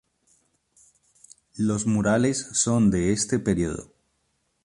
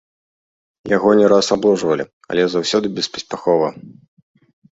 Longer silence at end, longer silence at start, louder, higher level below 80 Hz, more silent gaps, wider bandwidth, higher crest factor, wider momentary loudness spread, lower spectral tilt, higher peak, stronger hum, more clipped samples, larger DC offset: about the same, 0.8 s vs 0.85 s; first, 1.55 s vs 0.85 s; second, -23 LUFS vs -17 LUFS; first, -48 dBFS vs -58 dBFS; second, none vs 2.13-2.21 s; first, 11.5 kHz vs 8 kHz; about the same, 18 dB vs 16 dB; about the same, 9 LU vs 11 LU; about the same, -5 dB/octave vs -4.5 dB/octave; second, -8 dBFS vs -2 dBFS; neither; neither; neither